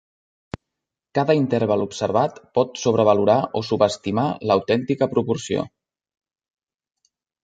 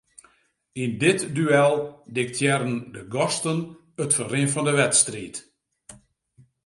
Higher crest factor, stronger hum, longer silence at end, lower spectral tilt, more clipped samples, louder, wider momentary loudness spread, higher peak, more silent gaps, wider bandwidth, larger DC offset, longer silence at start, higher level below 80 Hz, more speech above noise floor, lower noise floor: about the same, 20 dB vs 20 dB; neither; first, 1.75 s vs 0.7 s; first, -6 dB/octave vs -4 dB/octave; neither; about the same, -21 LUFS vs -23 LUFS; second, 10 LU vs 14 LU; about the same, -2 dBFS vs -4 dBFS; neither; second, 9.2 kHz vs 11.5 kHz; neither; first, 1.15 s vs 0.75 s; first, -56 dBFS vs -64 dBFS; first, 64 dB vs 41 dB; first, -84 dBFS vs -64 dBFS